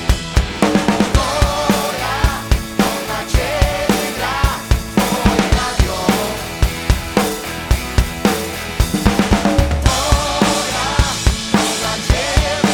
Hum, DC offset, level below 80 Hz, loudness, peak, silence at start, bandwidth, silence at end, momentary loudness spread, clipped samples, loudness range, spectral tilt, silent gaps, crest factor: none; under 0.1%; -20 dBFS; -17 LUFS; -2 dBFS; 0 s; over 20 kHz; 0 s; 5 LU; under 0.1%; 2 LU; -4.5 dB/octave; none; 14 dB